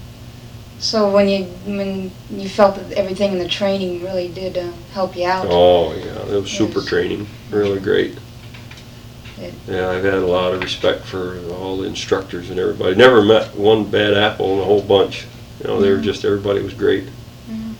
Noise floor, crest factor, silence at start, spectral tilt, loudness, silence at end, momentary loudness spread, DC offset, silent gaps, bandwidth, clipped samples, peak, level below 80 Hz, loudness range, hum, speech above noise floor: -37 dBFS; 18 dB; 0 s; -5.5 dB/octave; -17 LUFS; 0 s; 21 LU; under 0.1%; none; 19 kHz; under 0.1%; 0 dBFS; -44 dBFS; 7 LU; none; 20 dB